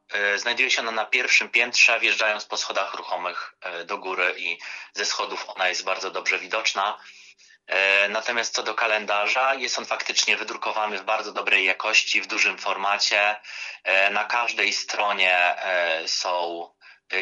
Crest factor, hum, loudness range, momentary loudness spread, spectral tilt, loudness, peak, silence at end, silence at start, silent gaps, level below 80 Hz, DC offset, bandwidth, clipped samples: 20 dB; none; 5 LU; 11 LU; 0.5 dB/octave; -22 LUFS; -4 dBFS; 0 s; 0.1 s; none; -84 dBFS; under 0.1%; 12 kHz; under 0.1%